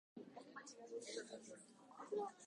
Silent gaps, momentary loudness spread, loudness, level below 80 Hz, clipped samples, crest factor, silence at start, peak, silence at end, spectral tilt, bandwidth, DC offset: none; 13 LU; -53 LUFS; under -90 dBFS; under 0.1%; 18 dB; 0.15 s; -34 dBFS; 0 s; -3 dB/octave; 11 kHz; under 0.1%